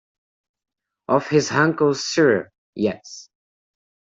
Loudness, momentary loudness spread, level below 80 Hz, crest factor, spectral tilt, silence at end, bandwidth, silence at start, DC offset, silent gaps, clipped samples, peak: -20 LUFS; 20 LU; -64 dBFS; 20 dB; -5 dB/octave; 0.95 s; 8 kHz; 1.1 s; under 0.1%; 2.58-2.73 s; under 0.1%; -4 dBFS